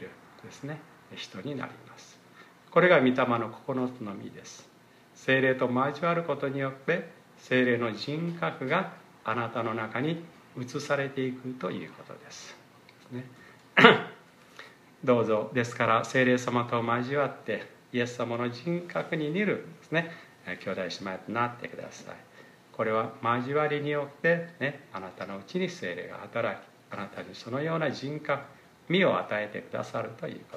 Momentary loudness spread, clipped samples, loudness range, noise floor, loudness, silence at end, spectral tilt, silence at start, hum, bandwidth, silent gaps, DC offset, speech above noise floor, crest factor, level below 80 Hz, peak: 19 LU; under 0.1%; 8 LU; -56 dBFS; -29 LUFS; 0 s; -5.5 dB/octave; 0 s; none; 13 kHz; none; under 0.1%; 27 dB; 30 dB; -76 dBFS; 0 dBFS